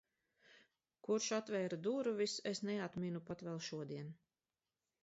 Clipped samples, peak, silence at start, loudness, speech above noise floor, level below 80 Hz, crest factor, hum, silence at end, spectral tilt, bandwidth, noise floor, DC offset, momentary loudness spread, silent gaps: under 0.1%; -28 dBFS; 0.5 s; -42 LUFS; over 49 dB; -82 dBFS; 16 dB; none; 0.9 s; -4.5 dB/octave; 7.6 kHz; under -90 dBFS; under 0.1%; 10 LU; none